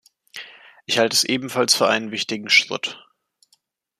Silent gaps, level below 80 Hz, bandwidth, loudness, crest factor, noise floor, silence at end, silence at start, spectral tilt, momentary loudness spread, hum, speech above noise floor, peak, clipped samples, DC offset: none; -70 dBFS; 15 kHz; -19 LUFS; 22 dB; -65 dBFS; 1 s; 0.35 s; -1.5 dB/octave; 22 LU; none; 45 dB; 0 dBFS; under 0.1%; under 0.1%